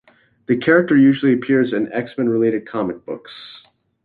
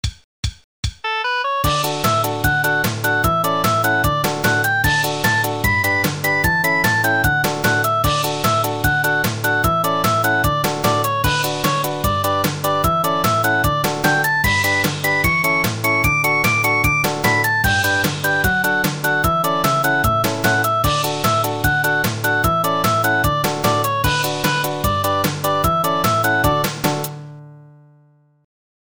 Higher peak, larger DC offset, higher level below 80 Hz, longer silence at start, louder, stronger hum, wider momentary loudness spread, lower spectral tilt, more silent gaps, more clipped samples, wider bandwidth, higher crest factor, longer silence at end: about the same, -2 dBFS vs -2 dBFS; second, under 0.1% vs 0.2%; second, -60 dBFS vs -34 dBFS; first, 0.5 s vs 0.05 s; about the same, -17 LUFS vs -17 LUFS; neither; first, 18 LU vs 3 LU; first, -9.5 dB/octave vs -4 dB/octave; second, none vs 0.24-0.43 s, 0.64-0.83 s; neither; second, 4.5 kHz vs over 20 kHz; about the same, 16 dB vs 16 dB; second, 0.5 s vs 1.25 s